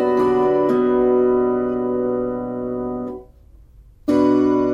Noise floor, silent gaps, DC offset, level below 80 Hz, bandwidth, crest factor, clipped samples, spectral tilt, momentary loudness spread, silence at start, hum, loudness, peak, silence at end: -46 dBFS; none; under 0.1%; -46 dBFS; 6.8 kHz; 12 dB; under 0.1%; -8.5 dB/octave; 11 LU; 0 s; none; -19 LUFS; -6 dBFS; 0 s